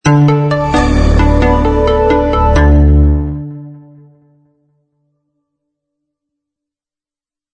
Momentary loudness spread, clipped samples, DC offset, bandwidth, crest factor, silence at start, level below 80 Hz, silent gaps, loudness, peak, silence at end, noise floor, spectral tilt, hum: 10 LU; under 0.1%; under 0.1%; 8.8 kHz; 12 dB; 0.05 s; -16 dBFS; none; -11 LUFS; 0 dBFS; 3.8 s; under -90 dBFS; -7.5 dB/octave; none